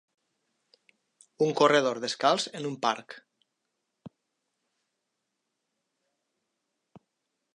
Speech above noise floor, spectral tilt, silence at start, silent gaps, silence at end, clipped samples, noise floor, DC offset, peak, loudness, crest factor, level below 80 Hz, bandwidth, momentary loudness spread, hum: 56 dB; -3.5 dB/octave; 1.4 s; none; 3.45 s; under 0.1%; -82 dBFS; under 0.1%; -8 dBFS; -26 LUFS; 24 dB; -84 dBFS; 11 kHz; 14 LU; none